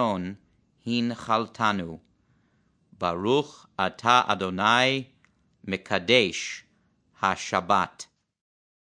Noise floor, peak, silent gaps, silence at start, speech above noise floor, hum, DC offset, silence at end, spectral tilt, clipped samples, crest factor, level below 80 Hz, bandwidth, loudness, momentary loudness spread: -67 dBFS; -4 dBFS; none; 0 s; 42 dB; none; under 0.1%; 0.9 s; -4 dB/octave; under 0.1%; 22 dB; -66 dBFS; 10.5 kHz; -25 LUFS; 18 LU